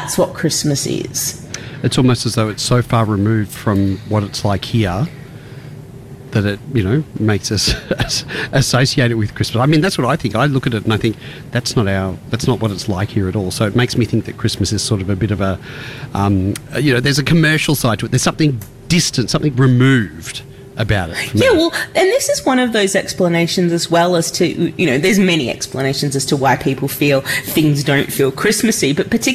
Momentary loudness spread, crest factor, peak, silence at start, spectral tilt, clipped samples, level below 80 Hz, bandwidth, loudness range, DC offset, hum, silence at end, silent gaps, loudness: 8 LU; 10 dB; -4 dBFS; 0 s; -5 dB/octave; under 0.1%; -38 dBFS; 15.5 kHz; 4 LU; under 0.1%; none; 0 s; none; -16 LUFS